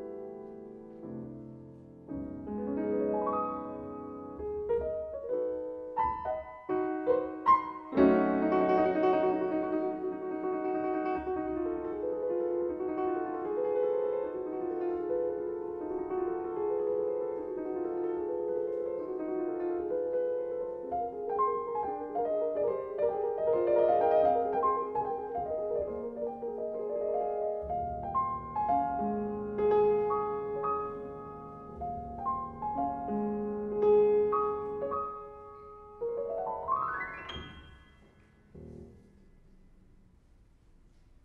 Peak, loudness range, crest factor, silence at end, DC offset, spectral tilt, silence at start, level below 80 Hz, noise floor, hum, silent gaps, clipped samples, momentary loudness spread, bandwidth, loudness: -12 dBFS; 7 LU; 20 dB; 2.25 s; under 0.1%; -9 dB/octave; 0 s; -58 dBFS; -61 dBFS; none; none; under 0.1%; 16 LU; 5.8 kHz; -32 LUFS